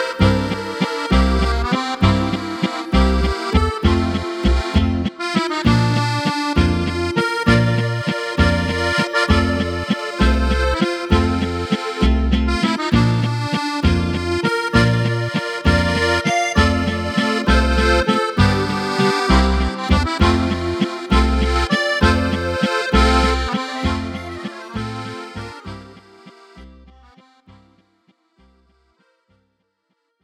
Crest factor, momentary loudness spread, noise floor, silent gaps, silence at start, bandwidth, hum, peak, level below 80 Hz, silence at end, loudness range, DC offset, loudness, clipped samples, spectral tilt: 18 dB; 7 LU; -71 dBFS; none; 0 s; 12.5 kHz; none; 0 dBFS; -24 dBFS; 3.5 s; 4 LU; under 0.1%; -18 LUFS; under 0.1%; -6 dB/octave